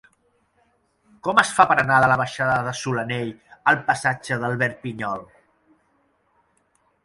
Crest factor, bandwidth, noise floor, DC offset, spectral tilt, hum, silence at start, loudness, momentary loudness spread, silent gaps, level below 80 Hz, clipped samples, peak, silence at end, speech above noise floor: 24 dB; 11.5 kHz; -66 dBFS; under 0.1%; -4.5 dB/octave; none; 1.25 s; -21 LUFS; 13 LU; none; -58 dBFS; under 0.1%; 0 dBFS; 1.8 s; 45 dB